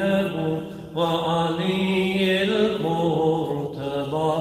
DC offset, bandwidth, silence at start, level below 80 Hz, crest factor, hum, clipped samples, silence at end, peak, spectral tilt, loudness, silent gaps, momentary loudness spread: under 0.1%; 16 kHz; 0 s; -56 dBFS; 14 dB; none; under 0.1%; 0 s; -8 dBFS; -6.5 dB/octave; -23 LUFS; none; 7 LU